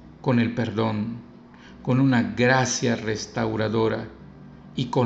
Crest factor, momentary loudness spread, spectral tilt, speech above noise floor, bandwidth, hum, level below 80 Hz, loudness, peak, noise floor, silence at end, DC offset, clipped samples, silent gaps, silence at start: 18 dB; 13 LU; -5.5 dB/octave; 23 dB; 8.2 kHz; none; -54 dBFS; -24 LUFS; -6 dBFS; -46 dBFS; 0 s; under 0.1%; under 0.1%; none; 0 s